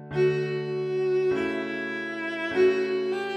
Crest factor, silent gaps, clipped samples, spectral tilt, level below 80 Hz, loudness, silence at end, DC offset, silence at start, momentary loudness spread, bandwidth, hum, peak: 14 dB; none; under 0.1%; -7 dB/octave; -64 dBFS; -26 LUFS; 0 s; under 0.1%; 0 s; 8 LU; 8.4 kHz; none; -12 dBFS